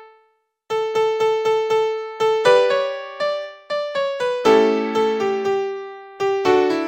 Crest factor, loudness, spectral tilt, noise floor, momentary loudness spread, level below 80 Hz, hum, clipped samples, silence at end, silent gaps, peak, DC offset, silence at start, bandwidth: 18 dB; -19 LUFS; -4 dB/octave; -63 dBFS; 11 LU; -62 dBFS; none; under 0.1%; 0 s; none; -2 dBFS; under 0.1%; 0 s; 16 kHz